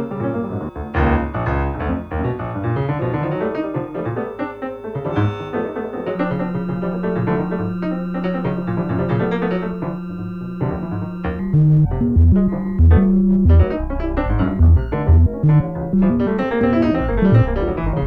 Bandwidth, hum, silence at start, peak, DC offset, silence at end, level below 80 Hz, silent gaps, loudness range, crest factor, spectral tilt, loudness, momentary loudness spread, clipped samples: 4.6 kHz; none; 0 s; -2 dBFS; under 0.1%; 0 s; -24 dBFS; none; 8 LU; 16 dB; -10.5 dB/octave; -19 LUFS; 11 LU; under 0.1%